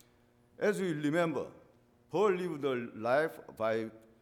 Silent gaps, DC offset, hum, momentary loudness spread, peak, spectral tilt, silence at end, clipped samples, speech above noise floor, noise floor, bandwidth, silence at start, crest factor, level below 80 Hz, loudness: none; under 0.1%; none; 8 LU; -18 dBFS; -6 dB/octave; 0.25 s; under 0.1%; 34 dB; -66 dBFS; 17 kHz; 0.6 s; 16 dB; -76 dBFS; -33 LUFS